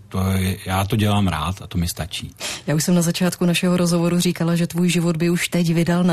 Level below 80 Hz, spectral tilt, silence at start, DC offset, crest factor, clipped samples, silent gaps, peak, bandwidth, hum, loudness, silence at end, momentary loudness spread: -46 dBFS; -5.5 dB/octave; 0 s; 0.2%; 12 dB; under 0.1%; none; -6 dBFS; 14 kHz; none; -20 LUFS; 0 s; 7 LU